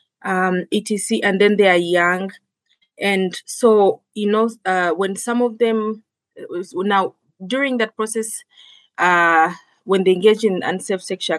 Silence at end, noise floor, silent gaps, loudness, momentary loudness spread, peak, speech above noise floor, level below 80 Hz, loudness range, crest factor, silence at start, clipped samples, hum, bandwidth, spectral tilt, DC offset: 0 s; -65 dBFS; none; -18 LUFS; 13 LU; -2 dBFS; 48 dB; -76 dBFS; 4 LU; 18 dB; 0.25 s; under 0.1%; none; 12.5 kHz; -4.5 dB/octave; under 0.1%